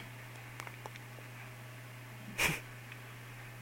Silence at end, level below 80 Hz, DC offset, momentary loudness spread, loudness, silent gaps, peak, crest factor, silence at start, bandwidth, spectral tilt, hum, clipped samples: 0 s; -62 dBFS; under 0.1%; 16 LU; -41 LUFS; none; -16 dBFS; 28 dB; 0 s; 16.5 kHz; -3 dB/octave; none; under 0.1%